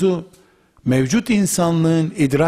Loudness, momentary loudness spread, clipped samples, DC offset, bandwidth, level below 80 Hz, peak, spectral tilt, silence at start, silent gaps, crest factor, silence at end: -18 LUFS; 6 LU; under 0.1%; under 0.1%; 15.5 kHz; -48 dBFS; -6 dBFS; -6 dB/octave; 0 s; none; 12 dB; 0 s